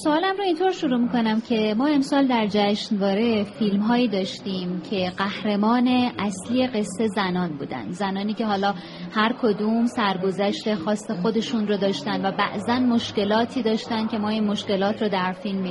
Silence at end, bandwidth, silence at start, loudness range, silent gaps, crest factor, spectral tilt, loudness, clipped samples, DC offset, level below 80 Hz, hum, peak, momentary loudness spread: 0 s; 11.5 kHz; 0 s; 2 LU; none; 16 dB; -6 dB/octave; -23 LUFS; under 0.1%; under 0.1%; -60 dBFS; none; -6 dBFS; 6 LU